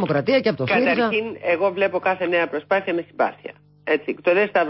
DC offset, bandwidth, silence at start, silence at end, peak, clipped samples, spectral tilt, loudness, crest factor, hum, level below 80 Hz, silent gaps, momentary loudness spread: under 0.1%; 5.8 kHz; 0 s; 0 s; -8 dBFS; under 0.1%; -10 dB/octave; -21 LUFS; 14 dB; 50 Hz at -55 dBFS; -64 dBFS; none; 6 LU